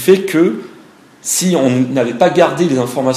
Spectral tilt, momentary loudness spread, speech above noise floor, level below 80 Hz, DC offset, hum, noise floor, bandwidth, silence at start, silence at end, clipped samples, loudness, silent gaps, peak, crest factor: -5 dB/octave; 5 LU; 29 dB; -60 dBFS; under 0.1%; none; -42 dBFS; 15.5 kHz; 0 s; 0 s; 0.1%; -13 LUFS; none; 0 dBFS; 14 dB